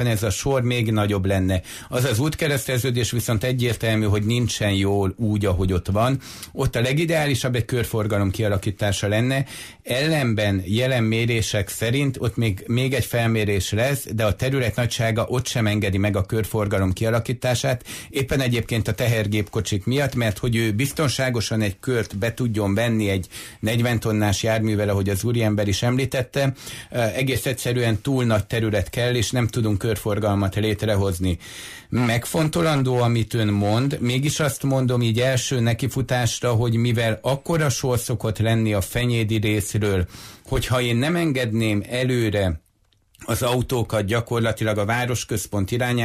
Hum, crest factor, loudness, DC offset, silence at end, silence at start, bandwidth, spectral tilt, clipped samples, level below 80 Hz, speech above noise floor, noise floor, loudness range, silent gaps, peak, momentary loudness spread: none; 12 dB; -22 LUFS; under 0.1%; 0 s; 0 s; 15.5 kHz; -5.5 dB/octave; under 0.1%; -42 dBFS; 41 dB; -62 dBFS; 2 LU; none; -10 dBFS; 4 LU